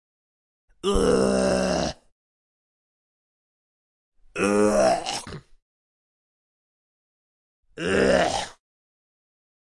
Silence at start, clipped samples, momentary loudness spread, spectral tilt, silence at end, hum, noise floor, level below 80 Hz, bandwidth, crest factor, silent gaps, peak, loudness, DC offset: 0.85 s; under 0.1%; 14 LU; -4.5 dB/octave; 1.25 s; none; under -90 dBFS; -44 dBFS; 11.5 kHz; 20 dB; 2.12-4.12 s, 5.62-7.63 s; -6 dBFS; -23 LUFS; under 0.1%